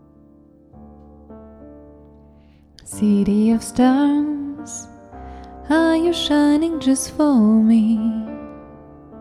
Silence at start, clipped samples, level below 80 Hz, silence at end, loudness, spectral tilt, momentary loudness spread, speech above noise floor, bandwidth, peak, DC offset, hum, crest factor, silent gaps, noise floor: 0.8 s; under 0.1%; -46 dBFS; 0 s; -17 LUFS; -5.5 dB/octave; 23 LU; 33 dB; 13.5 kHz; -4 dBFS; under 0.1%; none; 16 dB; none; -49 dBFS